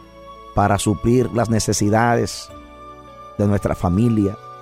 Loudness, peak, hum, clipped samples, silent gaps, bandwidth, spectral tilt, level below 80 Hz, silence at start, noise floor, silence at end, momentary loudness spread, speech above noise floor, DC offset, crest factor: -19 LUFS; -6 dBFS; none; under 0.1%; none; 15.5 kHz; -6 dB/octave; -38 dBFS; 0.15 s; -40 dBFS; 0 s; 22 LU; 22 dB; under 0.1%; 14 dB